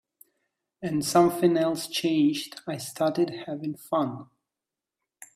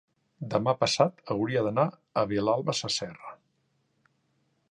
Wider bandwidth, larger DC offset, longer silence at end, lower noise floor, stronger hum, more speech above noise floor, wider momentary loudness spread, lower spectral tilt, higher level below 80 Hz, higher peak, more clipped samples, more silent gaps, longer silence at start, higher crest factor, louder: first, 15.5 kHz vs 11 kHz; neither; second, 0.1 s vs 1.35 s; first, -89 dBFS vs -73 dBFS; neither; first, 63 dB vs 46 dB; about the same, 13 LU vs 14 LU; about the same, -5 dB/octave vs -4.5 dB/octave; second, -70 dBFS vs -64 dBFS; about the same, -8 dBFS vs -6 dBFS; neither; neither; first, 0.8 s vs 0.4 s; about the same, 20 dB vs 22 dB; about the same, -26 LUFS vs -28 LUFS